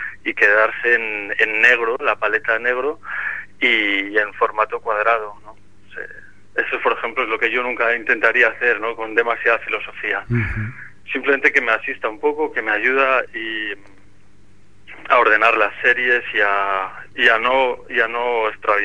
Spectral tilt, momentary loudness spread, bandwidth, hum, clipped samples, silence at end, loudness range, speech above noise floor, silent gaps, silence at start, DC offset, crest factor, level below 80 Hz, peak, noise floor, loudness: -5.5 dB/octave; 11 LU; 10 kHz; none; under 0.1%; 0 s; 5 LU; 34 dB; none; 0 s; 1%; 18 dB; -48 dBFS; 0 dBFS; -53 dBFS; -18 LUFS